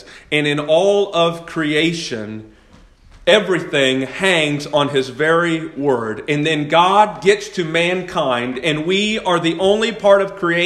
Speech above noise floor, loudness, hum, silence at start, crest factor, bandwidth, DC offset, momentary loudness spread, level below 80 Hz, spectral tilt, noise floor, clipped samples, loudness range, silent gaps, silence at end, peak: 30 dB; -16 LUFS; none; 0.05 s; 16 dB; 12.5 kHz; under 0.1%; 7 LU; -52 dBFS; -4.5 dB/octave; -47 dBFS; under 0.1%; 2 LU; none; 0 s; 0 dBFS